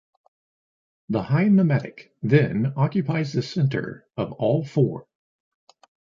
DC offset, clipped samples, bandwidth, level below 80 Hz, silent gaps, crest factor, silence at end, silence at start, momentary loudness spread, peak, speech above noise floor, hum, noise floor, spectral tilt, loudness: under 0.1%; under 0.1%; 7.4 kHz; -60 dBFS; none; 20 dB; 1.1 s; 1.1 s; 12 LU; -4 dBFS; over 68 dB; none; under -90 dBFS; -8.5 dB/octave; -23 LUFS